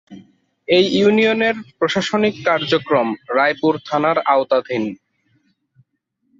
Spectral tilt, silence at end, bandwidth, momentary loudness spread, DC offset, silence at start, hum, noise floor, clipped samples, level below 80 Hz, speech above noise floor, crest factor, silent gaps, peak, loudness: -5 dB/octave; 1.45 s; 7.8 kHz; 7 LU; under 0.1%; 0.1 s; none; -69 dBFS; under 0.1%; -60 dBFS; 53 dB; 16 dB; none; -2 dBFS; -17 LUFS